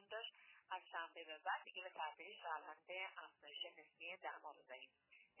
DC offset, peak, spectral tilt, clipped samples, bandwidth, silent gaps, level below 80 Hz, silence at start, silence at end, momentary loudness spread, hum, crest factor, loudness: under 0.1%; -32 dBFS; 3.5 dB/octave; under 0.1%; 4 kHz; none; under -90 dBFS; 0 s; 0 s; 11 LU; none; 20 dB; -51 LUFS